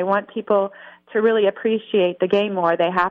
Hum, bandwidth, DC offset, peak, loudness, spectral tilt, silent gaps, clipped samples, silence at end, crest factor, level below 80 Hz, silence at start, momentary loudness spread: none; 5.6 kHz; under 0.1%; -6 dBFS; -20 LUFS; -7.5 dB/octave; none; under 0.1%; 0 s; 14 dB; -66 dBFS; 0 s; 5 LU